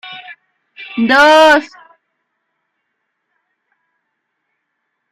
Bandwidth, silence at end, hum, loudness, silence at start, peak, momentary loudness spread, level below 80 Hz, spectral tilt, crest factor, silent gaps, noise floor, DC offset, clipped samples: 15.5 kHz; 3.45 s; none; -9 LUFS; 0.05 s; 0 dBFS; 27 LU; -56 dBFS; -3 dB/octave; 16 dB; none; -72 dBFS; under 0.1%; under 0.1%